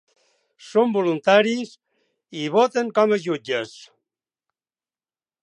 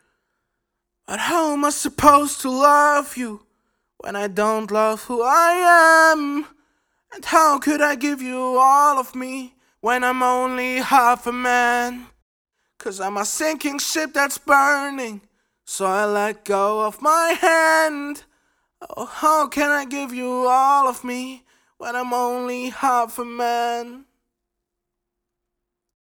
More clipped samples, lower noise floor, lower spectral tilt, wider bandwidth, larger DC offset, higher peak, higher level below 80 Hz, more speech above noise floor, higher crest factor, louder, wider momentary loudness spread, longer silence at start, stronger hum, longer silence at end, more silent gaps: neither; first, under -90 dBFS vs -81 dBFS; first, -5 dB/octave vs -2.5 dB/octave; second, 10.5 kHz vs over 20 kHz; neither; about the same, -2 dBFS vs 0 dBFS; second, -78 dBFS vs -58 dBFS; first, over 70 dB vs 62 dB; about the same, 22 dB vs 20 dB; second, -21 LUFS vs -18 LUFS; about the same, 14 LU vs 16 LU; second, 0.65 s vs 1.1 s; neither; second, 1.65 s vs 2.05 s; second, none vs 12.22-12.45 s